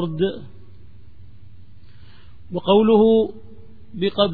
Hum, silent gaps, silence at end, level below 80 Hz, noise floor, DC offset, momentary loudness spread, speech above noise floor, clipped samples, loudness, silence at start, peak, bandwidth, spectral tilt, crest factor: none; none; 0 s; -50 dBFS; -47 dBFS; 1%; 19 LU; 29 dB; under 0.1%; -19 LUFS; 0 s; -4 dBFS; 4.7 kHz; -10 dB/octave; 18 dB